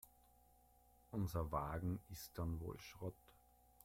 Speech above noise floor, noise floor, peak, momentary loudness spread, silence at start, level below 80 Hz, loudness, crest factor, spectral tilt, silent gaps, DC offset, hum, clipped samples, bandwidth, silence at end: 26 dB; -71 dBFS; -30 dBFS; 9 LU; 0.05 s; -60 dBFS; -47 LUFS; 18 dB; -7 dB/octave; none; under 0.1%; none; under 0.1%; 16.5 kHz; 0.5 s